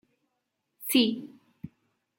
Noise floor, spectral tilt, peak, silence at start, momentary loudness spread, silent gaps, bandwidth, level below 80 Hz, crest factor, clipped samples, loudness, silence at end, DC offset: -81 dBFS; -3 dB/octave; -10 dBFS; 0.8 s; 24 LU; none; 17 kHz; -72 dBFS; 22 dB; under 0.1%; -25 LUFS; 0.5 s; under 0.1%